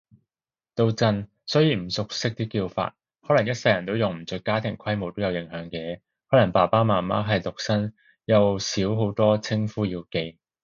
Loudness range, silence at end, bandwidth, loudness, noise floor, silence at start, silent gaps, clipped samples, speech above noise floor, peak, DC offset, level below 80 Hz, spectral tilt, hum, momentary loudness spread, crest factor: 3 LU; 0.3 s; 7.6 kHz; -24 LUFS; under -90 dBFS; 0.75 s; none; under 0.1%; over 67 dB; -4 dBFS; under 0.1%; -54 dBFS; -6 dB/octave; none; 12 LU; 20 dB